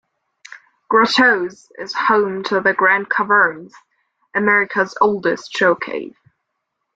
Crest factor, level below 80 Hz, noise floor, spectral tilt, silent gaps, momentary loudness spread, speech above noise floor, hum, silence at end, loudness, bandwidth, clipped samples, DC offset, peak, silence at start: 18 dB; -64 dBFS; -75 dBFS; -4.5 dB/octave; none; 13 LU; 58 dB; none; 0.85 s; -16 LUFS; 8.8 kHz; under 0.1%; under 0.1%; 0 dBFS; 0.9 s